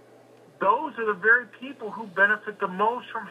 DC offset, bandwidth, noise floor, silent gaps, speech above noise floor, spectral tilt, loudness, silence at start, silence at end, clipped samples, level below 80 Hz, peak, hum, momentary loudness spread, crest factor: under 0.1%; 11 kHz; -53 dBFS; none; 28 dB; -6 dB/octave; -24 LUFS; 0.6 s; 0 s; under 0.1%; under -90 dBFS; -6 dBFS; none; 16 LU; 20 dB